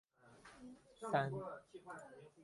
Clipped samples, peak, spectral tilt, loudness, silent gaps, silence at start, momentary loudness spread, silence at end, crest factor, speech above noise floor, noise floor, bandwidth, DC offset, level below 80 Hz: under 0.1%; -22 dBFS; -6.5 dB/octave; -44 LUFS; none; 0.25 s; 21 LU; 0 s; 24 dB; 20 dB; -64 dBFS; 11.5 kHz; under 0.1%; -78 dBFS